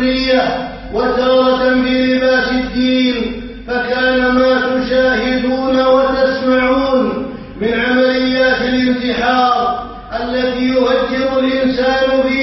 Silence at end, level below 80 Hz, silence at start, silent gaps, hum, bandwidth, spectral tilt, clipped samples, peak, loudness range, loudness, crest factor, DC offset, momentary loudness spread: 0 s; -36 dBFS; 0 s; none; none; 6 kHz; -2 dB/octave; under 0.1%; 0 dBFS; 2 LU; -14 LUFS; 12 dB; under 0.1%; 8 LU